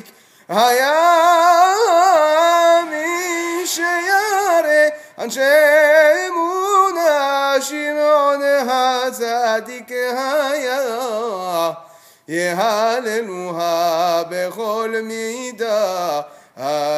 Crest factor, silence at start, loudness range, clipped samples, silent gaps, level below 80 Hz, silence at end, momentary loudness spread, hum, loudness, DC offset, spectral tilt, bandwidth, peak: 14 dB; 0.5 s; 7 LU; under 0.1%; none; -76 dBFS; 0 s; 11 LU; none; -16 LUFS; under 0.1%; -2.5 dB/octave; 16 kHz; -2 dBFS